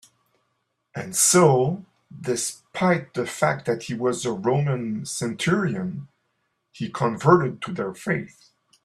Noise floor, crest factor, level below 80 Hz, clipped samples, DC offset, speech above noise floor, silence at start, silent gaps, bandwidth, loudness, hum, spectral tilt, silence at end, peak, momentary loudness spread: -74 dBFS; 22 dB; -62 dBFS; under 0.1%; under 0.1%; 51 dB; 0.95 s; none; 14.5 kHz; -23 LUFS; none; -4.5 dB/octave; 0.6 s; -2 dBFS; 15 LU